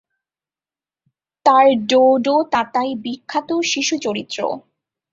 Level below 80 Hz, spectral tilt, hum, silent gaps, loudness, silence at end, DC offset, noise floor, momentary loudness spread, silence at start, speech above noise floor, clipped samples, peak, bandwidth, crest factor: -64 dBFS; -3 dB/octave; none; none; -17 LUFS; 0.55 s; under 0.1%; under -90 dBFS; 11 LU; 1.45 s; over 73 dB; under 0.1%; -2 dBFS; 7.8 kHz; 18 dB